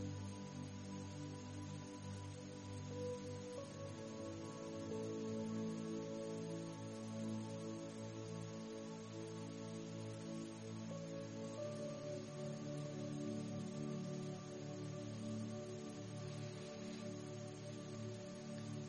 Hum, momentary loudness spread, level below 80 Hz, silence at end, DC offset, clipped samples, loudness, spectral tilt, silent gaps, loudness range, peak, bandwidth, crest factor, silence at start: none; 5 LU; -76 dBFS; 0 s; under 0.1%; under 0.1%; -48 LUFS; -6 dB/octave; none; 3 LU; -34 dBFS; 11 kHz; 14 dB; 0 s